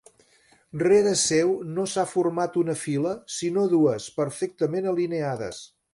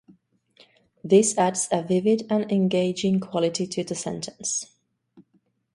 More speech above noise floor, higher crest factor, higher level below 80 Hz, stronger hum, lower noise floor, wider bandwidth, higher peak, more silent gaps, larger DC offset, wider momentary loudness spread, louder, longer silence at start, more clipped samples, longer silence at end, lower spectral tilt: second, 36 dB vs 45 dB; about the same, 16 dB vs 20 dB; about the same, -64 dBFS vs -66 dBFS; neither; second, -60 dBFS vs -68 dBFS; about the same, 11.5 kHz vs 11.5 kHz; second, -10 dBFS vs -4 dBFS; neither; neither; about the same, 9 LU vs 11 LU; about the same, -24 LUFS vs -23 LUFS; second, 0.75 s vs 1.05 s; neither; second, 0.25 s vs 0.55 s; about the same, -4.5 dB/octave vs -5 dB/octave